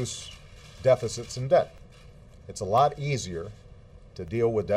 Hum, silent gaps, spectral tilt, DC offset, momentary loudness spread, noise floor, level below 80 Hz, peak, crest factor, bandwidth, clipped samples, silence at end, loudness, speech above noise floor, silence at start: none; none; -5.5 dB/octave; under 0.1%; 19 LU; -50 dBFS; -52 dBFS; -10 dBFS; 18 dB; 14 kHz; under 0.1%; 0 s; -27 LUFS; 24 dB; 0 s